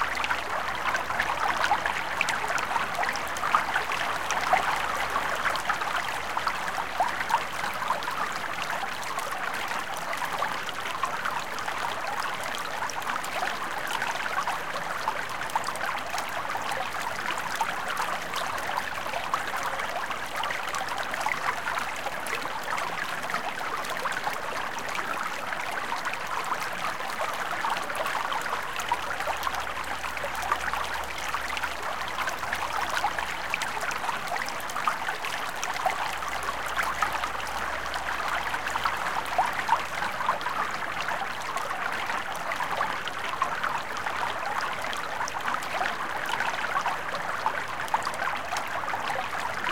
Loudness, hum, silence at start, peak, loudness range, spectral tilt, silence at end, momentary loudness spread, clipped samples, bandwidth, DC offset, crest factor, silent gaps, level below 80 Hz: -29 LUFS; none; 0 s; -8 dBFS; 4 LU; -1.5 dB/octave; 0 s; 4 LU; under 0.1%; 17 kHz; 1%; 24 dB; none; -56 dBFS